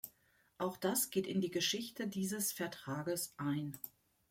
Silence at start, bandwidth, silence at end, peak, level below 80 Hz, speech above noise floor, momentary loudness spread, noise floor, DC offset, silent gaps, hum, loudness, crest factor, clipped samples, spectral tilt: 0.05 s; 16.5 kHz; 0.4 s; -22 dBFS; -78 dBFS; 34 dB; 9 LU; -73 dBFS; under 0.1%; none; none; -38 LUFS; 18 dB; under 0.1%; -3.5 dB/octave